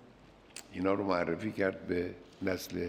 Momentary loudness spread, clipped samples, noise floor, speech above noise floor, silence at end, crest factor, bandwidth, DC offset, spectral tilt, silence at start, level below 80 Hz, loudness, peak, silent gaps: 13 LU; under 0.1%; -58 dBFS; 24 dB; 0 s; 20 dB; 16.5 kHz; under 0.1%; -5.5 dB/octave; 0 s; -66 dBFS; -34 LUFS; -16 dBFS; none